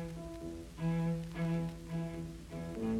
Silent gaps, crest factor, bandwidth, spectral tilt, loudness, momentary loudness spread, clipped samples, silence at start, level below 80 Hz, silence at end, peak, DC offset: none; 12 dB; 12.5 kHz; -7.5 dB/octave; -39 LUFS; 10 LU; under 0.1%; 0 s; -54 dBFS; 0 s; -26 dBFS; under 0.1%